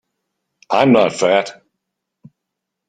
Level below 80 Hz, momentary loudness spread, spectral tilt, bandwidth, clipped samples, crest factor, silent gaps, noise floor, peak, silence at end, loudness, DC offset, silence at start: -62 dBFS; 8 LU; -5 dB/octave; 9.4 kHz; under 0.1%; 18 dB; none; -79 dBFS; -2 dBFS; 1.35 s; -15 LUFS; under 0.1%; 0.7 s